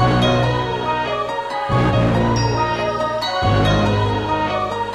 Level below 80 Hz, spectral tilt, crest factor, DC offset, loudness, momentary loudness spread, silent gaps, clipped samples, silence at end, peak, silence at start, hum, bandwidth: -32 dBFS; -6.5 dB/octave; 14 dB; under 0.1%; -18 LUFS; 5 LU; none; under 0.1%; 0 s; -4 dBFS; 0 s; none; 12 kHz